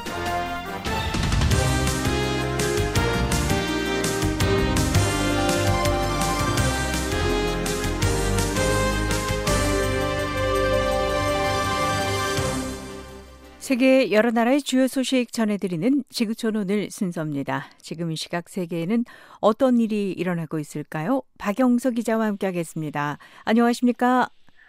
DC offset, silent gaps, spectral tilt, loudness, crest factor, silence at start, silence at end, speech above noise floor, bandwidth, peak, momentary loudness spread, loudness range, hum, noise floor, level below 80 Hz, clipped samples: under 0.1%; none; -5 dB/octave; -23 LUFS; 18 dB; 0 s; 0.2 s; 21 dB; 16 kHz; -6 dBFS; 9 LU; 3 LU; none; -43 dBFS; -34 dBFS; under 0.1%